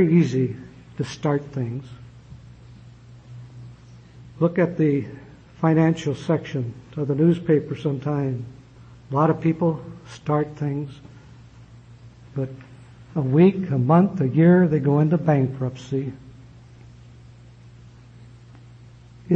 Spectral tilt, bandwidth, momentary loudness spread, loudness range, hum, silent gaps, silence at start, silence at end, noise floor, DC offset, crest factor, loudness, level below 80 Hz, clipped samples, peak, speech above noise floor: -9 dB/octave; 8 kHz; 22 LU; 12 LU; none; none; 0 s; 0 s; -46 dBFS; under 0.1%; 18 dB; -22 LUFS; -54 dBFS; under 0.1%; -4 dBFS; 25 dB